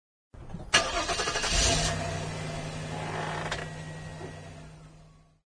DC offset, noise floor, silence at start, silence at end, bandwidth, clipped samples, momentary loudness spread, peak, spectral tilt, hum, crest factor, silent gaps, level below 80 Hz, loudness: under 0.1%; -55 dBFS; 0.35 s; 0.3 s; 10.5 kHz; under 0.1%; 20 LU; -4 dBFS; -2.5 dB/octave; none; 28 dB; none; -42 dBFS; -29 LUFS